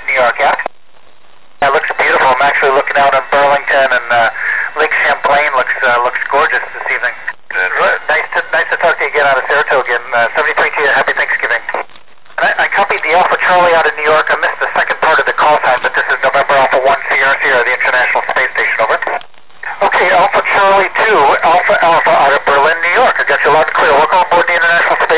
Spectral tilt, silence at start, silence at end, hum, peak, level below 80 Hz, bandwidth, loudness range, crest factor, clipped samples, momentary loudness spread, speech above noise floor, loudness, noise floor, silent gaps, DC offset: -6 dB/octave; 0 s; 0 s; none; -4 dBFS; -52 dBFS; 4 kHz; 3 LU; 8 dB; under 0.1%; 6 LU; 38 dB; -10 LUFS; -48 dBFS; none; 2%